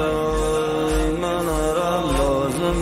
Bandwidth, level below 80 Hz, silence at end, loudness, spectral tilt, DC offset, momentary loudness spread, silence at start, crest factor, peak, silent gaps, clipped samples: 16 kHz; -30 dBFS; 0 s; -21 LUFS; -5.5 dB/octave; under 0.1%; 2 LU; 0 s; 12 dB; -10 dBFS; none; under 0.1%